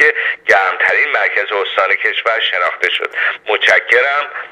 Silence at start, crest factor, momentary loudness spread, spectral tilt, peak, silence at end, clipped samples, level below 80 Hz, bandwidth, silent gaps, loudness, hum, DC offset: 0 s; 14 dB; 5 LU; -0.5 dB/octave; 0 dBFS; 0 s; under 0.1%; -62 dBFS; 12.5 kHz; none; -13 LUFS; none; under 0.1%